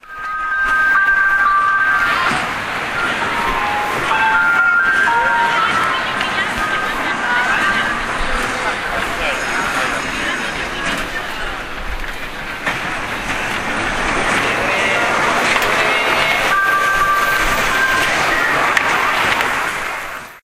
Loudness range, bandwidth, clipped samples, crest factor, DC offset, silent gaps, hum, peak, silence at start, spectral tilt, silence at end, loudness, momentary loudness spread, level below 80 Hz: 7 LU; 16 kHz; under 0.1%; 16 dB; under 0.1%; none; none; 0 dBFS; 0.05 s; -2.5 dB/octave; 0.05 s; -15 LUFS; 9 LU; -34 dBFS